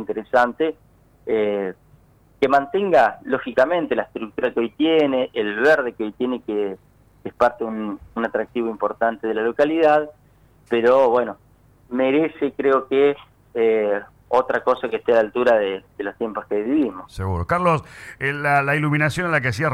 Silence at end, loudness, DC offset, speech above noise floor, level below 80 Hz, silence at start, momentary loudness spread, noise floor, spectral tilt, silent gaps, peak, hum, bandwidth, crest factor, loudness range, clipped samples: 0 s; -21 LUFS; under 0.1%; 34 dB; -52 dBFS; 0 s; 11 LU; -54 dBFS; -6.5 dB/octave; none; -6 dBFS; none; 13 kHz; 14 dB; 3 LU; under 0.1%